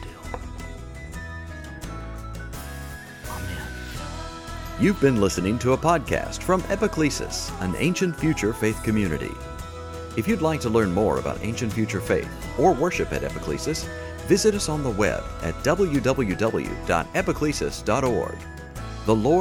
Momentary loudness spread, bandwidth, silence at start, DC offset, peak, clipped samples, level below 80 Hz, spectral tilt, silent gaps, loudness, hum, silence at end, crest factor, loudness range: 16 LU; 19 kHz; 0 s; under 0.1%; -6 dBFS; under 0.1%; -38 dBFS; -5.5 dB/octave; none; -24 LUFS; none; 0 s; 18 dB; 12 LU